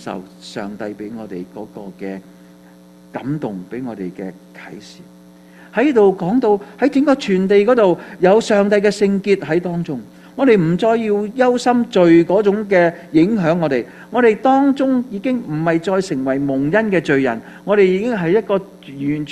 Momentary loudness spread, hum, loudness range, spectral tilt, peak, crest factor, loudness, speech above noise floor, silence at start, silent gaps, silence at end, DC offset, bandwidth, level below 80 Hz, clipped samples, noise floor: 17 LU; none; 14 LU; -7 dB/octave; 0 dBFS; 16 dB; -16 LUFS; 28 dB; 0 s; none; 0 s; under 0.1%; 12 kHz; -56 dBFS; under 0.1%; -44 dBFS